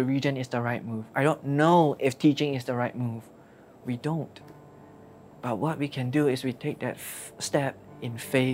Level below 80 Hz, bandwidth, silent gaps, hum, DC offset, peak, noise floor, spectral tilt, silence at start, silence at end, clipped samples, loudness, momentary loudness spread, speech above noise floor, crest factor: -68 dBFS; 16 kHz; none; none; under 0.1%; -8 dBFS; -51 dBFS; -6 dB/octave; 0 s; 0 s; under 0.1%; -28 LUFS; 14 LU; 25 dB; 20 dB